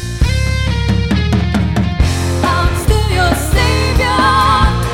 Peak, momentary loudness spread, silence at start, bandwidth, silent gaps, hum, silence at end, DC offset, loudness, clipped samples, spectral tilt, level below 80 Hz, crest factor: 0 dBFS; 5 LU; 0 s; 17 kHz; none; none; 0 s; under 0.1%; -13 LUFS; under 0.1%; -5.5 dB/octave; -18 dBFS; 12 dB